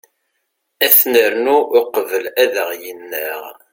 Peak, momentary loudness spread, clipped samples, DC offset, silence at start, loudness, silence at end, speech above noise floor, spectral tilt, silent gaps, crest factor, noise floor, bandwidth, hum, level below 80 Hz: 0 dBFS; 16 LU; under 0.1%; under 0.1%; 0.8 s; -14 LUFS; 0.2 s; 55 dB; -1 dB/octave; none; 16 dB; -71 dBFS; 17 kHz; none; -64 dBFS